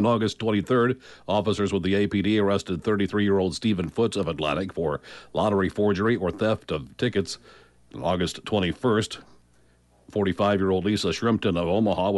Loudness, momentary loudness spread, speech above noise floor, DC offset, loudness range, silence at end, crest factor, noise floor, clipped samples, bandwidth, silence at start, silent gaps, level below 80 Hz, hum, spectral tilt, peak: -25 LUFS; 7 LU; 36 dB; under 0.1%; 4 LU; 0 s; 14 dB; -60 dBFS; under 0.1%; 11.5 kHz; 0 s; none; -52 dBFS; 60 Hz at -55 dBFS; -6 dB/octave; -12 dBFS